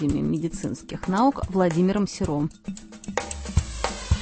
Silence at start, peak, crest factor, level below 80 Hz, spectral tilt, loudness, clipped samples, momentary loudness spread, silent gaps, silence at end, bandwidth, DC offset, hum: 0 s; -6 dBFS; 18 dB; -34 dBFS; -6 dB/octave; -25 LUFS; under 0.1%; 10 LU; none; 0 s; 8.8 kHz; under 0.1%; none